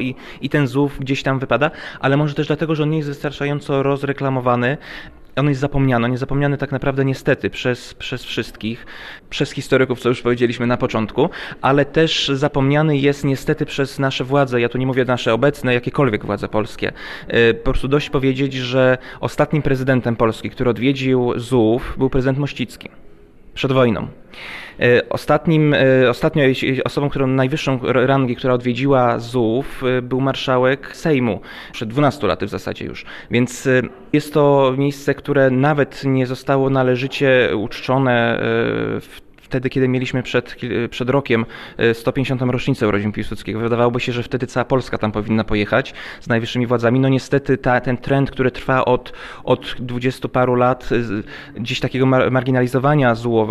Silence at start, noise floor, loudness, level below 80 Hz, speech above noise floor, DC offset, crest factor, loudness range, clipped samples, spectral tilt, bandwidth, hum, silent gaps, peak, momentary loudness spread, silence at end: 0 s; -41 dBFS; -18 LUFS; -38 dBFS; 24 dB; under 0.1%; 14 dB; 3 LU; under 0.1%; -6.5 dB/octave; 13.5 kHz; none; none; -4 dBFS; 10 LU; 0 s